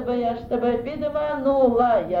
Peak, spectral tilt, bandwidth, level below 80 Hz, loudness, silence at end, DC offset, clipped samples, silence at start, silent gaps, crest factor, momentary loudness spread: -8 dBFS; -8.5 dB/octave; 5.4 kHz; -46 dBFS; -22 LUFS; 0 s; under 0.1%; under 0.1%; 0 s; none; 14 dB; 7 LU